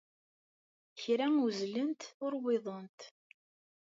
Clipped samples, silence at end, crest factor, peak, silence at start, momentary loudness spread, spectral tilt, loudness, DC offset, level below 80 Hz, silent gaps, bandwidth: under 0.1%; 0.8 s; 16 dB; -20 dBFS; 0.95 s; 22 LU; -5 dB/octave; -35 LUFS; under 0.1%; under -90 dBFS; 2.14-2.20 s, 2.89-2.98 s; 7.8 kHz